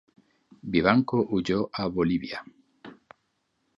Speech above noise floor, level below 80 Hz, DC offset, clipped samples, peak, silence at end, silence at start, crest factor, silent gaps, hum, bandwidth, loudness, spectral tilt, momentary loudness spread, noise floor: 50 dB; -54 dBFS; under 0.1%; under 0.1%; -4 dBFS; 0.85 s; 0.65 s; 24 dB; none; none; 7.6 kHz; -26 LUFS; -7 dB/octave; 15 LU; -75 dBFS